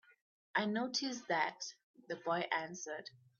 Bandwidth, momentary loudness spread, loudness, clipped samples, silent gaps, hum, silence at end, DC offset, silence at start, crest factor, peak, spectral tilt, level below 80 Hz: 7.2 kHz; 11 LU; -39 LUFS; under 0.1%; 1.84-1.94 s; none; 0.25 s; under 0.1%; 0.55 s; 20 dB; -20 dBFS; -2 dB/octave; -86 dBFS